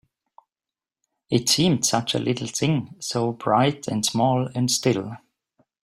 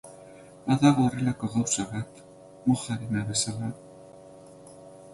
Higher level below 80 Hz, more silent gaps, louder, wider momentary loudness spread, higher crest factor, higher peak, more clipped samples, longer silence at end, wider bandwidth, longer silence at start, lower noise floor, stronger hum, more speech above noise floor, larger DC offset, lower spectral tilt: about the same, -60 dBFS vs -60 dBFS; neither; first, -22 LUFS vs -27 LUFS; second, 7 LU vs 26 LU; about the same, 18 dB vs 22 dB; about the same, -6 dBFS vs -8 dBFS; neither; first, 0.65 s vs 0 s; first, 16 kHz vs 11.5 kHz; first, 1.3 s vs 0.05 s; first, under -90 dBFS vs -49 dBFS; neither; first, over 68 dB vs 23 dB; neither; about the same, -4 dB/octave vs -5 dB/octave